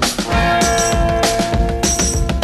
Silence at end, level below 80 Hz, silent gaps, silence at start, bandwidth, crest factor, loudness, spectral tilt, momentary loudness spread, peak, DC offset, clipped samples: 0 s; -22 dBFS; none; 0 s; 15.5 kHz; 16 dB; -15 LUFS; -3.5 dB/octave; 3 LU; 0 dBFS; under 0.1%; under 0.1%